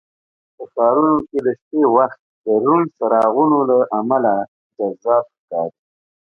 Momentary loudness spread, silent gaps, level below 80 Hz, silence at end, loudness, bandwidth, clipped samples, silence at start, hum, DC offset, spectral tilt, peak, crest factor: 12 LU; 1.62-1.71 s, 2.19-2.44 s, 4.48-4.70 s, 5.39-5.48 s; -64 dBFS; 0.7 s; -17 LUFS; 3.4 kHz; under 0.1%; 0.6 s; none; under 0.1%; -10 dB/octave; -2 dBFS; 16 dB